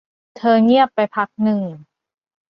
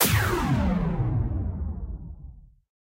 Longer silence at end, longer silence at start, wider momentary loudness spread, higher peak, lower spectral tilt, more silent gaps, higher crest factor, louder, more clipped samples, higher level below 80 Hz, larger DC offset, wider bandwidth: first, 0.75 s vs 0.45 s; first, 0.4 s vs 0 s; second, 10 LU vs 16 LU; first, -2 dBFS vs -6 dBFS; first, -8.5 dB/octave vs -5 dB/octave; neither; about the same, 16 dB vs 20 dB; first, -17 LUFS vs -26 LUFS; neither; second, -66 dBFS vs -34 dBFS; neither; second, 5.8 kHz vs 16 kHz